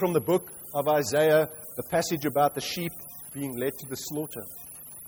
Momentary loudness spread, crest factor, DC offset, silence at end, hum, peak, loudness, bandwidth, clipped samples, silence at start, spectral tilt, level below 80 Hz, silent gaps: 16 LU; 16 dB; under 0.1%; 0 s; none; -12 dBFS; -27 LUFS; over 20 kHz; under 0.1%; 0 s; -4.5 dB/octave; -64 dBFS; none